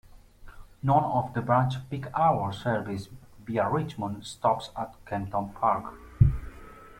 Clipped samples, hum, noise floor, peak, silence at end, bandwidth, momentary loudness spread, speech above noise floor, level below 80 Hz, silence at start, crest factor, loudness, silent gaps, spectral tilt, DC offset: under 0.1%; none; -48 dBFS; -6 dBFS; 0 s; 13 kHz; 13 LU; 20 dB; -42 dBFS; 0.05 s; 22 dB; -28 LUFS; none; -7.5 dB/octave; under 0.1%